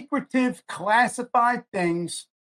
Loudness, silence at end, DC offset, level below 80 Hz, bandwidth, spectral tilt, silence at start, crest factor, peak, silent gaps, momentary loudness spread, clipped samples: -24 LUFS; 0.4 s; under 0.1%; -70 dBFS; 14.5 kHz; -4.5 dB/octave; 0 s; 18 dB; -8 dBFS; 1.68-1.72 s; 10 LU; under 0.1%